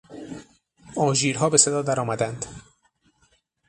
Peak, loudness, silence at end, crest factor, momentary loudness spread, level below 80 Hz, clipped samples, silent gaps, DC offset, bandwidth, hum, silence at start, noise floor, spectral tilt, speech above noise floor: -2 dBFS; -21 LUFS; 1.1 s; 22 dB; 22 LU; -58 dBFS; under 0.1%; none; under 0.1%; 11.5 kHz; none; 0.1 s; -65 dBFS; -3.5 dB/octave; 43 dB